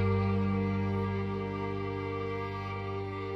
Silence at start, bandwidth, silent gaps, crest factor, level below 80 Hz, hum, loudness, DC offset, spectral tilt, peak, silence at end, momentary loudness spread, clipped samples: 0 s; 6 kHz; none; 14 dB; -54 dBFS; 50 Hz at -55 dBFS; -33 LUFS; under 0.1%; -9 dB/octave; -18 dBFS; 0 s; 7 LU; under 0.1%